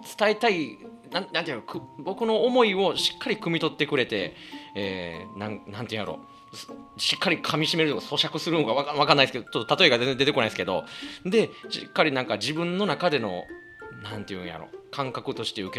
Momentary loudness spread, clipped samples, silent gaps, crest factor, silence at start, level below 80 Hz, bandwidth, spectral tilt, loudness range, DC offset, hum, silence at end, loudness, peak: 17 LU; under 0.1%; none; 26 dB; 0 s; -64 dBFS; 14 kHz; -4.5 dB/octave; 7 LU; under 0.1%; none; 0 s; -25 LUFS; 0 dBFS